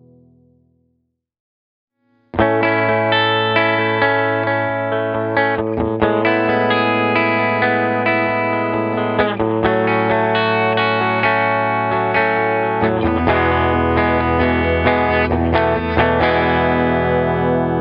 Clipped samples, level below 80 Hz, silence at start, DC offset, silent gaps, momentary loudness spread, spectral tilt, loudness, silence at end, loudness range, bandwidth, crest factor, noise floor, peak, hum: under 0.1%; -36 dBFS; 2.35 s; under 0.1%; none; 3 LU; -9 dB/octave; -16 LUFS; 0 s; 1 LU; 5.6 kHz; 16 dB; -69 dBFS; 0 dBFS; none